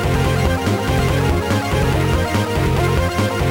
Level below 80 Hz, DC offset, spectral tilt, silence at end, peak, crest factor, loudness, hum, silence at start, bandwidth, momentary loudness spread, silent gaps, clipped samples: -26 dBFS; under 0.1%; -6 dB/octave; 0 s; -6 dBFS; 12 dB; -18 LUFS; none; 0 s; 19 kHz; 2 LU; none; under 0.1%